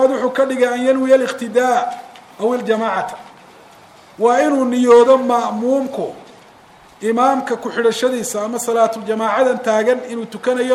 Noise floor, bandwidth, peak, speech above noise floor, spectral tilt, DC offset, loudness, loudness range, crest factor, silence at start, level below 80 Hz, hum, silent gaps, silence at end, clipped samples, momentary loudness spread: -45 dBFS; 14.5 kHz; -2 dBFS; 29 dB; -4 dB/octave; under 0.1%; -16 LUFS; 4 LU; 16 dB; 0 s; -66 dBFS; none; none; 0 s; under 0.1%; 10 LU